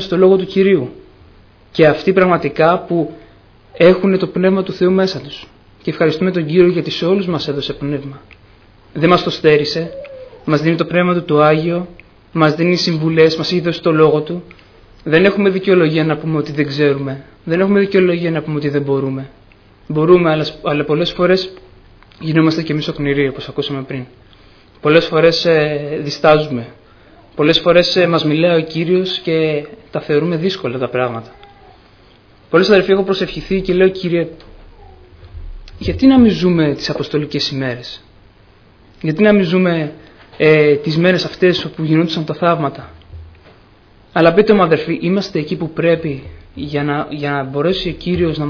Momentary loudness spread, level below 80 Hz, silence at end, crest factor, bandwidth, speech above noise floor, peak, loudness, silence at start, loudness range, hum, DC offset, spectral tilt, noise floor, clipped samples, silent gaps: 14 LU; -42 dBFS; 0 s; 16 dB; 5.4 kHz; 33 dB; 0 dBFS; -14 LUFS; 0 s; 3 LU; none; under 0.1%; -7 dB/octave; -47 dBFS; under 0.1%; none